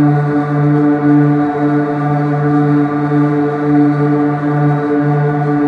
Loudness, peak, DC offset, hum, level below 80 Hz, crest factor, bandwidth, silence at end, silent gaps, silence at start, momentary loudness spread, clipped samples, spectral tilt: -13 LUFS; -2 dBFS; under 0.1%; none; -54 dBFS; 10 dB; 4.8 kHz; 0 s; none; 0 s; 4 LU; under 0.1%; -10.5 dB/octave